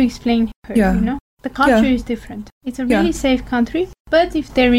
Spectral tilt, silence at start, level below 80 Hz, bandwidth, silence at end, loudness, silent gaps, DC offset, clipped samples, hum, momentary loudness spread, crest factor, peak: -5.5 dB/octave; 0 s; -34 dBFS; 15 kHz; 0 s; -17 LUFS; 0.56-0.62 s, 1.20-1.37 s, 2.52-2.61 s, 4.00-4.05 s; under 0.1%; under 0.1%; none; 12 LU; 12 dB; -4 dBFS